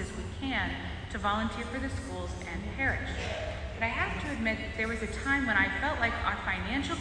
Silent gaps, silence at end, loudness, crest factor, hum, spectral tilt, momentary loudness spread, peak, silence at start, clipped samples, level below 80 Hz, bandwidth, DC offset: none; 0 s; -32 LUFS; 20 dB; none; -5 dB/octave; 10 LU; -12 dBFS; 0 s; under 0.1%; -42 dBFS; 10.5 kHz; under 0.1%